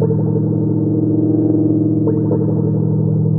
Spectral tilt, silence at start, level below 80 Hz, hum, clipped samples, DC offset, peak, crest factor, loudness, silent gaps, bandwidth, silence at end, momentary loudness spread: -17 dB/octave; 0 s; -52 dBFS; none; under 0.1%; under 0.1%; -2 dBFS; 12 dB; -16 LUFS; none; 1.7 kHz; 0 s; 2 LU